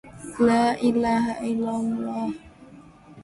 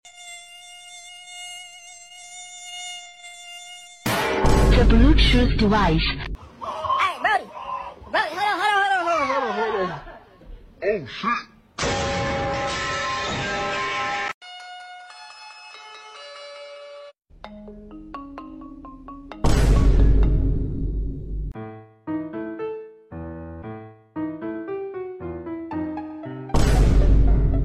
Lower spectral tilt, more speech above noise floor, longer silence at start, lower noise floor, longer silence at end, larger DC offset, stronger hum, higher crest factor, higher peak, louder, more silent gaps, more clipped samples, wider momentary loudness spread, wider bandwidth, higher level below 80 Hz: about the same, -6 dB/octave vs -5.5 dB/octave; about the same, 25 dB vs 26 dB; about the same, 0.05 s vs 0.05 s; first, -48 dBFS vs -43 dBFS; about the same, 0 s vs 0 s; neither; neither; about the same, 16 dB vs 18 dB; second, -8 dBFS vs -4 dBFS; about the same, -24 LUFS vs -23 LUFS; second, none vs 14.34-14.41 s; neither; second, 12 LU vs 21 LU; second, 11.5 kHz vs 14 kHz; second, -54 dBFS vs -26 dBFS